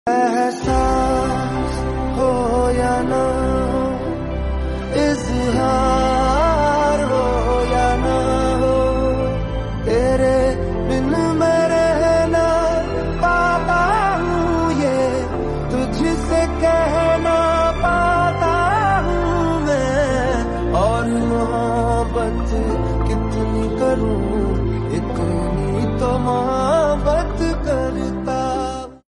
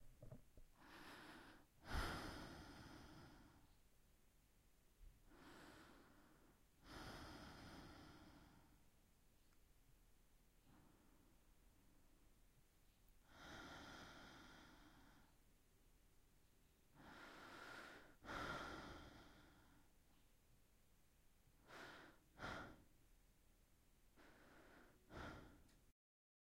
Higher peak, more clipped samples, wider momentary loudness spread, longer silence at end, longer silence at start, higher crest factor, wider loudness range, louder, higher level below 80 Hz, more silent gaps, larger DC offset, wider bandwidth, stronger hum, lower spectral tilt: first, -6 dBFS vs -34 dBFS; neither; second, 6 LU vs 17 LU; second, 0.1 s vs 0.55 s; about the same, 0.05 s vs 0 s; second, 12 dB vs 28 dB; second, 3 LU vs 11 LU; first, -18 LUFS vs -58 LUFS; first, -26 dBFS vs -68 dBFS; neither; neither; second, 11.5 kHz vs 16 kHz; neither; first, -6.5 dB/octave vs -4.5 dB/octave